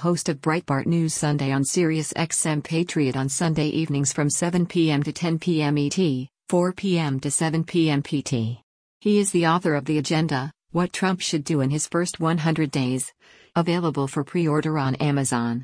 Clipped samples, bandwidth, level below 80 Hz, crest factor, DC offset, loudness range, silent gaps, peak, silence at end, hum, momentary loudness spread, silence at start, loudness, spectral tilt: under 0.1%; 10.5 kHz; -58 dBFS; 14 dB; under 0.1%; 1 LU; 8.63-9.00 s; -8 dBFS; 0 s; none; 4 LU; 0 s; -23 LUFS; -5 dB/octave